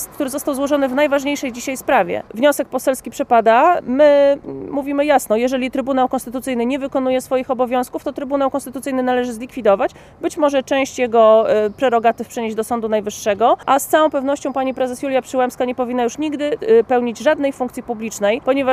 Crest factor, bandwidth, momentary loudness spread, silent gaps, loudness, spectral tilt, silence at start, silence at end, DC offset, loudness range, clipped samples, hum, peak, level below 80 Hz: 16 dB; 15.5 kHz; 10 LU; none; -17 LUFS; -4 dB/octave; 0 s; 0 s; under 0.1%; 4 LU; under 0.1%; none; -2 dBFS; -52 dBFS